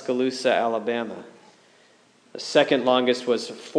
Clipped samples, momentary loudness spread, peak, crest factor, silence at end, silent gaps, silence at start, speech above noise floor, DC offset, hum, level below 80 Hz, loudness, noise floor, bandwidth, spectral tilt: under 0.1%; 15 LU; -4 dBFS; 20 dB; 0 s; none; 0 s; 34 dB; under 0.1%; none; -88 dBFS; -23 LUFS; -57 dBFS; 10.5 kHz; -4 dB/octave